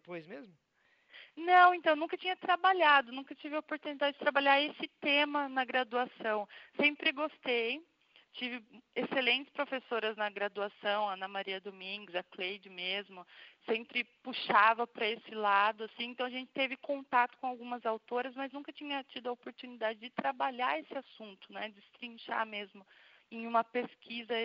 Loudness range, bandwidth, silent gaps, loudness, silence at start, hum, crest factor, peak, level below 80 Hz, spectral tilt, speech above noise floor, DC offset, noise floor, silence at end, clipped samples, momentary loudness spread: 9 LU; 5.8 kHz; none; -33 LUFS; 0.1 s; none; 24 dB; -12 dBFS; under -90 dBFS; 0.5 dB/octave; 28 dB; under 0.1%; -62 dBFS; 0 s; under 0.1%; 17 LU